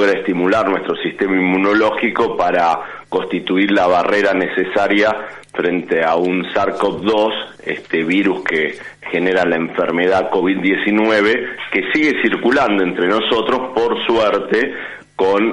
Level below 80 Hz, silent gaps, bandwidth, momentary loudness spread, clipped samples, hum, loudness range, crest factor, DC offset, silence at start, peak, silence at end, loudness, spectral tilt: -52 dBFS; none; 10.5 kHz; 7 LU; under 0.1%; none; 2 LU; 14 dB; under 0.1%; 0 s; -2 dBFS; 0 s; -16 LUFS; -5.5 dB/octave